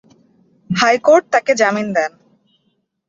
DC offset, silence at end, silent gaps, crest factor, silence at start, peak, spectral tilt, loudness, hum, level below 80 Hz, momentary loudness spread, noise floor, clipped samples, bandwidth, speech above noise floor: under 0.1%; 1 s; none; 16 dB; 0.7 s; -2 dBFS; -4 dB/octave; -15 LUFS; none; -62 dBFS; 9 LU; -66 dBFS; under 0.1%; 8 kHz; 52 dB